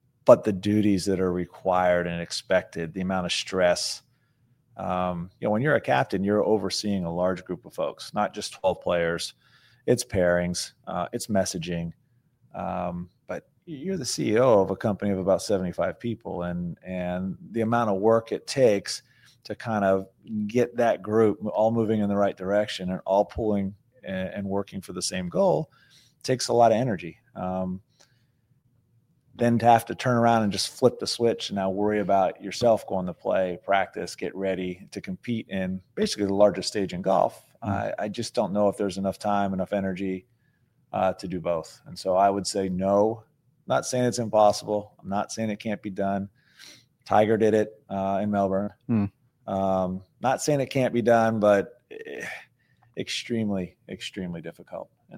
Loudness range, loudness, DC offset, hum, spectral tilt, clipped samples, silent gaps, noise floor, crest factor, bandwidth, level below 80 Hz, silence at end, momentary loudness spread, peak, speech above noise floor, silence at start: 4 LU; -26 LUFS; under 0.1%; none; -5.5 dB/octave; under 0.1%; none; -66 dBFS; 24 dB; 16 kHz; -58 dBFS; 0 s; 14 LU; -2 dBFS; 41 dB; 0.25 s